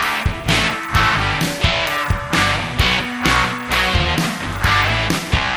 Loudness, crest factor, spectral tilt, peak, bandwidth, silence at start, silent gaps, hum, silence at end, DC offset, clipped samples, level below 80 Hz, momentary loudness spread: -17 LUFS; 18 dB; -4 dB/octave; 0 dBFS; over 20 kHz; 0 s; none; none; 0 s; under 0.1%; under 0.1%; -28 dBFS; 3 LU